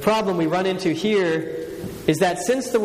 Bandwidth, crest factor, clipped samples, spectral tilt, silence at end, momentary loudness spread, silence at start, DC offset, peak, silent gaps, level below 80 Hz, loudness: 15.5 kHz; 18 dB; under 0.1%; -5 dB/octave; 0 s; 8 LU; 0 s; under 0.1%; -2 dBFS; none; -52 dBFS; -22 LUFS